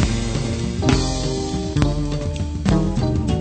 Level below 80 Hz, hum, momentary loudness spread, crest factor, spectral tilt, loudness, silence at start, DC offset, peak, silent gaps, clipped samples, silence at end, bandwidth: -26 dBFS; none; 5 LU; 18 dB; -6 dB/octave; -21 LUFS; 0 s; under 0.1%; -2 dBFS; none; under 0.1%; 0 s; 9.2 kHz